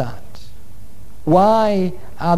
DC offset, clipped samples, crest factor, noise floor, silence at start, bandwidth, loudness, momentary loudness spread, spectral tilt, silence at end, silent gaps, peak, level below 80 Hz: 6%; under 0.1%; 16 dB; -42 dBFS; 0 s; 13.5 kHz; -17 LUFS; 15 LU; -7.5 dB/octave; 0 s; none; -2 dBFS; -44 dBFS